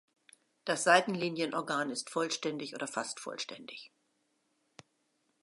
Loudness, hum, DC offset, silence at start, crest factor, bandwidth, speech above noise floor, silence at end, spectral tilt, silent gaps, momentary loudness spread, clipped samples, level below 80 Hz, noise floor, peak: -33 LUFS; none; under 0.1%; 0.65 s; 26 dB; 11.5 kHz; 44 dB; 1.55 s; -3 dB/octave; none; 16 LU; under 0.1%; -88 dBFS; -77 dBFS; -10 dBFS